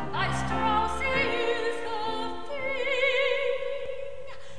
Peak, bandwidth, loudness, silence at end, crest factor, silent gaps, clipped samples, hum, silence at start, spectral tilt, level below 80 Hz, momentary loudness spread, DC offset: -12 dBFS; 11 kHz; -28 LUFS; 0 s; 16 dB; none; under 0.1%; none; 0 s; -4.5 dB/octave; -48 dBFS; 11 LU; 2%